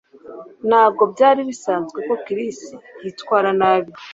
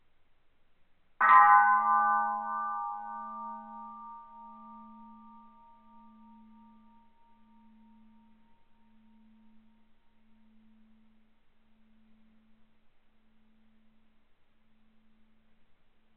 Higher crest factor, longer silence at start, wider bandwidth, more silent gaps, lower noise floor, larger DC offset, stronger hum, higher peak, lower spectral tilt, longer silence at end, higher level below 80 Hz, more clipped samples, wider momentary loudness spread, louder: second, 18 dB vs 26 dB; second, 0.25 s vs 1.2 s; first, 8 kHz vs 4.2 kHz; neither; second, -38 dBFS vs -63 dBFS; neither; neither; first, -2 dBFS vs -8 dBFS; first, -5 dB/octave vs -0.5 dB/octave; second, 0 s vs 11.45 s; about the same, -66 dBFS vs -70 dBFS; neither; second, 20 LU vs 30 LU; first, -18 LUFS vs -25 LUFS